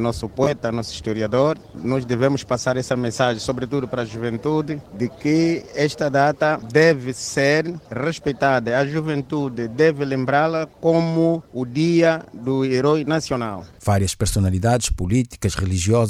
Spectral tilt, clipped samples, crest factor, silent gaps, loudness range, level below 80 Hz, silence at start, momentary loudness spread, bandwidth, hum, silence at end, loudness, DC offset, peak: -5.5 dB/octave; under 0.1%; 18 dB; none; 3 LU; -42 dBFS; 0 s; 8 LU; 15.5 kHz; none; 0 s; -21 LUFS; under 0.1%; -2 dBFS